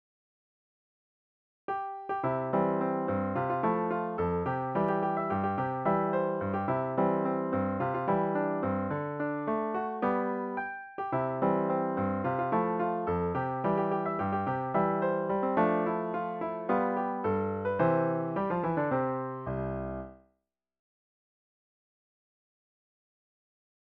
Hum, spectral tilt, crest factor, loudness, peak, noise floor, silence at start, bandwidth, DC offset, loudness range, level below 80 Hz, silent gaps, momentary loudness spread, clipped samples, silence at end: none; -7.5 dB/octave; 18 dB; -31 LUFS; -14 dBFS; -81 dBFS; 1.7 s; 5 kHz; under 0.1%; 4 LU; -60 dBFS; none; 6 LU; under 0.1%; 3.65 s